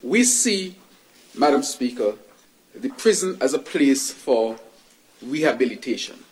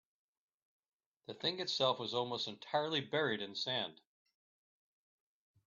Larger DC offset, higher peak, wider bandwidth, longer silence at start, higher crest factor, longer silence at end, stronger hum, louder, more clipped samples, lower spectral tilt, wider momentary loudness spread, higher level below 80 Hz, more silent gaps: neither; first, -6 dBFS vs -20 dBFS; first, 16.5 kHz vs 7.4 kHz; second, 0.05 s vs 1.3 s; second, 16 dB vs 22 dB; second, 0.2 s vs 1.8 s; neither; first, -21 LUFS vs -37 LUFS; neither; about the same, -2.5 dB/octave vs -1.5 dB/octave; first, 15 LU vs 7 LU; first, -70 dBFS vs -84 dBFS; neither